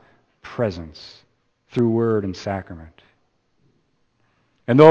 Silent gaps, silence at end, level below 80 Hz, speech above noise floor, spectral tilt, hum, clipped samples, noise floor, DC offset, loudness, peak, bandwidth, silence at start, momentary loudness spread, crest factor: none; 0 s; -54 dBFS; 42 dB; -8 dB/octave; none; under 0.1%; -65 dBFS; under 0.1%; -21 LUFS; 0 dBFS; 7.4 kHz; 0.45 s; 22 LU; 22 dB